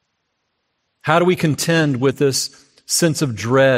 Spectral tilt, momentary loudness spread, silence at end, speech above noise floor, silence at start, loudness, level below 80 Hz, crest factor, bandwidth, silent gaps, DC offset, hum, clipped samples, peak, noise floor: -4.5 dB/octave; 6 LU; 0 s; 55 dB; 1.05 s; -17 LUFS; -58 dBFS; 18 dB; 16 kHz; none; under 0.1%; none; under 0.1%; 0 dBFS; -72 dBFS